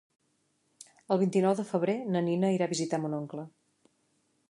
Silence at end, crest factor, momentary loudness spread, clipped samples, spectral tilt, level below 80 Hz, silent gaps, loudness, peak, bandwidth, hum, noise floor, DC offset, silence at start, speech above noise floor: 1 s; 18 dB; 12 LU; under 0.1%; -6.5 dB/octave; -80 dBFS; none; -29 LUFS; -14 dBFS; 11.5 kHz; none; -74 dBFS; under 0.1%; 0.8 s; 45 dB